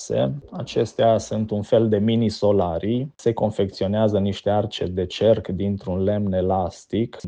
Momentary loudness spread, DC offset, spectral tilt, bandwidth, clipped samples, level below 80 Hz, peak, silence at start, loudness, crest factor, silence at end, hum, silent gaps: 6 LU; under 0.1%; -7 dB/octave; 9.4 kHz; under 0.1%; -50 dBFS; -6 dBFS; 0 s; -22 LUFS; 16 dB; 0 s; none; none